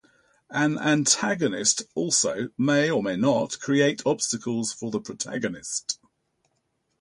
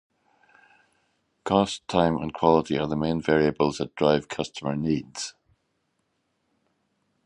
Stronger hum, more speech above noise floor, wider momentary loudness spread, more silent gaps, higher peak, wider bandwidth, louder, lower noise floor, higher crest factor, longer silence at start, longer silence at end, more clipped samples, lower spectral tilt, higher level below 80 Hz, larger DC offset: neither; about the same, 49 dB vs 50 dB; about the same, 9 LU vs 11 LU; neither; about the same, -6 dBFS vs -4 dBFS; about the same, 11.5 kHz vs 11 kHz; about the same, -24 LUFS vs -25 LUFS; about the same, -74 dBFS vs -74 dBFS; about the same, 20 dB vs 22 dB; second, 0.5 s vs 1.45 s; second, 1.05 s vs 1.95 s; neither; second, -3.5 dB/octave vs -5.5 dB/octave; second, -66 dBFS vs -52 dBFS; neither